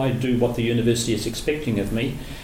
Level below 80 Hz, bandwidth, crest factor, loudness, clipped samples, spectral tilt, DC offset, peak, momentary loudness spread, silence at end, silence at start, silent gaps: -38 dBFS; 17 kHz; 16 dB; -23 LUFS; under 0.1%; -5.5 dB/octave; under 0.1%; -8 dBFS; 5 LU; 0 s; 0 s; none